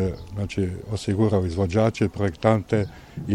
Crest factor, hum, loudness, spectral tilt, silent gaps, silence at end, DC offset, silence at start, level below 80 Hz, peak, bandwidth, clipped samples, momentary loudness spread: 20 dB; none; -24 LUFS; -7.5 dB/octave; none; 0 s; under 0.1%; 0 s; -44 dBFS; -4 dBFS; 11 kHz; under 0.1%; 8 LU